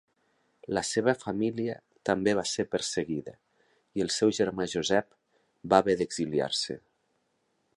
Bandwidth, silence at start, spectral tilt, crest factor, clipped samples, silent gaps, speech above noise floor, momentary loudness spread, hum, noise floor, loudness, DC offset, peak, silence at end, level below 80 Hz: 11.5 kHz; 0.7 s; -4 dB/octave; 24 dB; under 0.1%; none; 46 dB; 11 LU; none; -75 dBFS; -29 LUFS; under 0.1%; -6 dBFS; 1 s; -62 dBFS